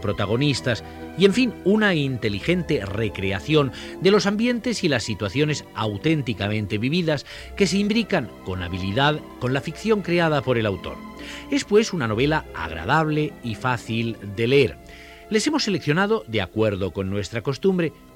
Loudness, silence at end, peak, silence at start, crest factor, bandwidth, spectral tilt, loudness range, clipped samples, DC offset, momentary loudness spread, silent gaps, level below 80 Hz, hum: -22 LUFS; 0.2 s; -4 dBFS; 0 s; 20 dB; 16 kHz; -5.5 dB/octave; 2 LU; under 0.1%; under 0.1%; 9 LU; none; -46 dBFS; none